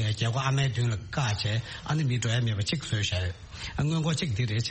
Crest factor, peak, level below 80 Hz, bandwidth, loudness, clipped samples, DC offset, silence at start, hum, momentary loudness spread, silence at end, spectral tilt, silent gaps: 16 dB; -12 dBFS; -48 dBFS; 8.8 kHz; -28 LUFS; under 0.1%; under 0.1%; 0 s; none; 5 LU; 0 s; -5 dB/octave; none